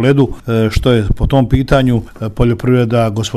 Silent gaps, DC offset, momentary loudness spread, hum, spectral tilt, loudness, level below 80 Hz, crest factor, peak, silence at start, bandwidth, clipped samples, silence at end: none; 0.4%; 4 LU; none; -7 dB/octave; -13 LUFS; -22 dBFS; 12 dB; 0 dBFS; 0 s; 13 kHz; under 0.1%; 0 s